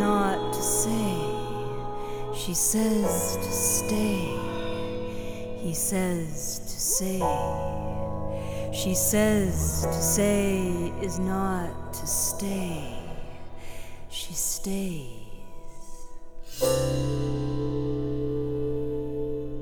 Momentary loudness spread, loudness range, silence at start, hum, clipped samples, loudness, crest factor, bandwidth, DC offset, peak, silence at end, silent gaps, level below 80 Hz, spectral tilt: 15 LU; 6 LU; 0 s; none; under 0.1%; -27 LUFS; 16 dB; over 20 kHz; under 0.1%; -12 dBFS; 0 s; none; -38 dBFS; -4.5 dB/octave